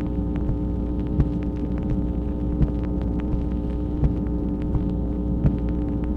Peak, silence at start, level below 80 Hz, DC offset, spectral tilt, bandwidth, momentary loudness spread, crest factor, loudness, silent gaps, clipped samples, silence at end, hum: -6 dBFS; 0 s; -26 dBFS; under 0.1%; -11 dB/octave; 4.1 kHz; 3 LU; 18 dB; -25 LUFS; none; under 0.1%; 0 s; none